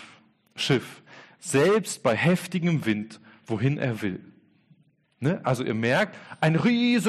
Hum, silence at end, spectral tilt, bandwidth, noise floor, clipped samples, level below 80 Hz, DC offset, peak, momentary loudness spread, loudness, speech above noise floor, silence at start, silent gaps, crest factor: none; 0 s; -5.5 dB/octave; 13 kHz; -62 dBFS; under 0.1%; -64 dBFS; under 0.1%; -12 dBFS; 12 LU; -25 LUFS; 37 dB; 0 s; none; 14 dB